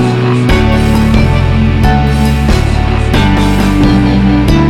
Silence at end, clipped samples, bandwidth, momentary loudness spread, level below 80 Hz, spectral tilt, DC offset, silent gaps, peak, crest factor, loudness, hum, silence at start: 0 s; under 0.1%; 15 kHz; 2 LU; -14 dBFS; -7 dB/octave; under 0.1%; none; 0 dBFS; 8 dB; -10 LUFS; none; 0 s